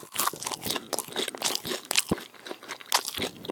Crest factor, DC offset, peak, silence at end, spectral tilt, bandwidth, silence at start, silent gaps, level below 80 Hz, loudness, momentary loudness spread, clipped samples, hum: 30 dB; under 0.1%; -2 dBFS; 0 s; -1.5 dB/octave; 18 kHz; 0 s; none; -60 dBFS; -29 LUFS; 13 LU; under 0.1%; none